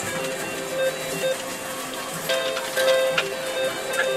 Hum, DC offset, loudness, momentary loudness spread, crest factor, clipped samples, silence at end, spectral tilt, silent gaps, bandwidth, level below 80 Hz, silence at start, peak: none; under 0.1%; -25 LUFS; 9 LU; 18 dB; under 0.1%; 0 s; -2 dB/octave; none; 16 kHz; -62 dBFS; 0 s; -6 dBFS